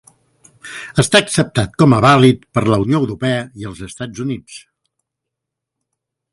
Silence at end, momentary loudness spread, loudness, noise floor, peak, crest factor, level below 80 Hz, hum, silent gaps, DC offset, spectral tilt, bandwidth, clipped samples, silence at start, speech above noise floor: 1.75 s; 19 LU; -14 LUFS; -81 dBFS; 0 dBFS; 16 dB; -46 dBFS; none; none; under 0.1%; -5.5 dB/octave; 11.5 kHz; under 0.1%; 0.65 s; 66 dB